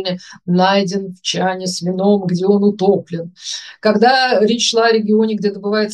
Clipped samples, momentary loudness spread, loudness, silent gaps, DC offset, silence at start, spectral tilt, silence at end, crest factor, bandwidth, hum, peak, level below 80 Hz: under 0.1%; 12 LU; -15 LUFS; none; under 0.1%; 0 s; -4.5 dB/octave; 0 s; 14 dB; 11.5 kHz; none; 0 dBFS; -66 dBFS